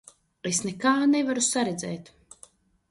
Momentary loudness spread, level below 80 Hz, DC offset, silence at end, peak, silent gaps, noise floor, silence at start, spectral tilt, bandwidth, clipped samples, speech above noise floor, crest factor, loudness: 14 LU; -66 dBFS; under 0.1%; 0.85 s; -10 dBFS; none; -56 dBFS; 0.45 s; -3 dB/octave; 11.5 kHz; under 0.1%; 31 dB; 16 dB; -25 LUFS